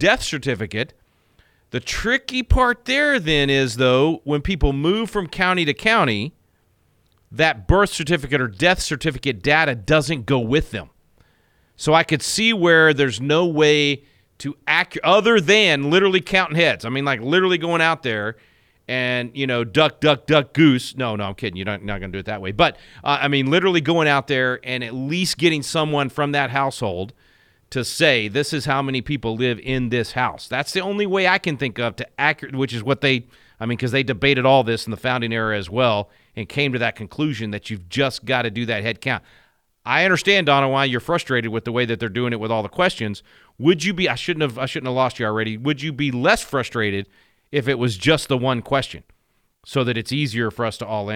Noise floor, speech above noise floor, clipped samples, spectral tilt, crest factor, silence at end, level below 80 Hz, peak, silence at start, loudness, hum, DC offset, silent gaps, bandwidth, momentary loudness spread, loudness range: -65 dBFS; 46 dB; under 0.1%; -5 dB/octave; 18 dB; 0 s; -38 dBFS; -2 dBFS; 0 s; -19 LUFS; none; under 0.1%; none; 17 kHz; 11 LU; 5 LU